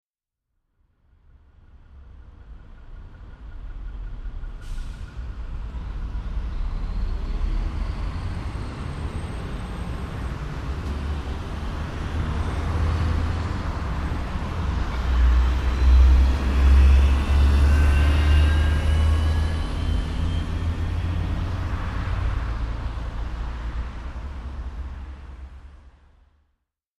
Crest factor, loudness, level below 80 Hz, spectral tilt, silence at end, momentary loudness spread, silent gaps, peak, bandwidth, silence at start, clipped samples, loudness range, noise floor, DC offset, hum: 16 dB; -25 LUFS; -24 dBFS; -7 dB/octave; 1.1 s; 19 LU; none; -6 dBFS; 10.5 kHz; 1.75 s; under 0.1%; 18 LU; -84 dBFS; under 0.1%; none